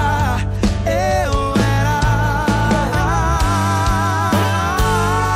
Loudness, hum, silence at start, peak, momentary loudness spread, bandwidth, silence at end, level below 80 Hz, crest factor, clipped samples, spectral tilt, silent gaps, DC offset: -17 LUFS; none; 0 s; -8 dBFS; 2 LU; 16 kHz; 0 s; -24 dBFS; 8 dB; under 0.1%; -5.5 dB/octave; none; under 0.1%